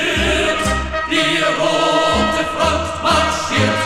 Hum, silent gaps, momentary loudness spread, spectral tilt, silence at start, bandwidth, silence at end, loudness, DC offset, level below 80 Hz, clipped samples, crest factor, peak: none; none; 4 LU; -3.5 dB/octave; 0 s; 16 kHz; 0 s; -16 LUFS; under 0.1%; -30 dBFS; under 0.1%; 14 dB; -2 dBFS